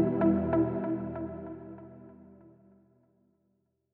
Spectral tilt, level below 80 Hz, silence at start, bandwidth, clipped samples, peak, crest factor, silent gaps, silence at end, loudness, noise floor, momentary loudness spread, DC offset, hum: -10 dB/octave; -56 dBFS; 0 s; 3.4 kHz; under 0.1%; -14 dBFS; 18 dB; none; 1.45 s; -30 LUFS; -76 dBFS; 24 LU; under 0.1%; none